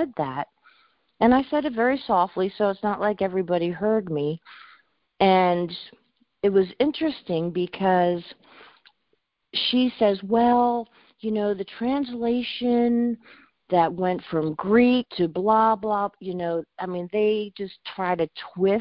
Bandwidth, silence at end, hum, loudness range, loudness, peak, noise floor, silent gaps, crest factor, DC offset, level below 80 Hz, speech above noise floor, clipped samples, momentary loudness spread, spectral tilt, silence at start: 5.4 kHz; 0 s; none; 3 LU; -24 LUFS; -4 dBFS; -73 dBFS; none; 20 dB; under 0.1%; -58 dBFS; 50 dB; under 0.1%; 10 LU; -10.5 dB/octave; 0 s